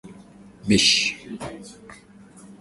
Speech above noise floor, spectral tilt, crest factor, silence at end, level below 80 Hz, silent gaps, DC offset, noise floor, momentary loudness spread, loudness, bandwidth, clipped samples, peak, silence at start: 26 dB; -2.5 dB/octave; 20 dB; 0.1 s; -52 dBFS; none; under 0.1%; -48 dBFS; 24 LU; -18 LUFS; 11.5 kHz; under 0.1%; -6 dBFS; 0.05 s